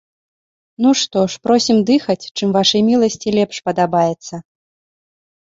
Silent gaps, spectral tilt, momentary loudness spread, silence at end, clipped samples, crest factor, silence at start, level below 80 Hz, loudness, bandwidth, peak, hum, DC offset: 2.31-2.35 s; -4.5 dB/octave; 7 LU; 1 s; under 0.1%; 16 dB; 0.8 s; -58 dBFS; -16 LUFS; 7.8 kHz; -2 dBFS; none; under 0.1%